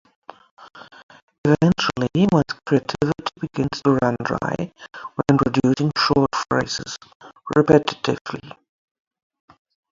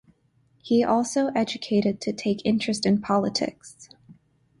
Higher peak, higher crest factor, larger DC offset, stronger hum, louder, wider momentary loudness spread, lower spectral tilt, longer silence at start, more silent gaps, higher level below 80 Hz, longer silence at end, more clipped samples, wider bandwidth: first, 0 dBFS vs -10 dBFS; first, 22 dB vs 16 dB; neither; neither; first, -20 LUFS vs -24 LUFS; first, 15 LU vs 6 LU; about the same, -6 dB/octave vs -5 dB/octave; about the same, 0.6 s vs 0.65 s; first, 1.03-1.09 s, 1.23-1.28 s, 1.38-1.44 s, 7.15-7.20 s, 8.21-8.25 s vs none; first, -50 dBFS vs -62 dBFS; first, 1.4 s vs 0.5 s; neither; second, 7.6 kHz vs 11.5 kHz